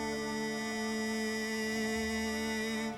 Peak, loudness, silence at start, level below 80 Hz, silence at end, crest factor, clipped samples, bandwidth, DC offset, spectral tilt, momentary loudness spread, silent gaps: -22 dBFS; -34 LUFS; 0 s; -58 dBFS; 0 s; 14 dB; under 0.1%; 18 kHz; under 0.1%; -3.5 dB/octave; 2 LU; none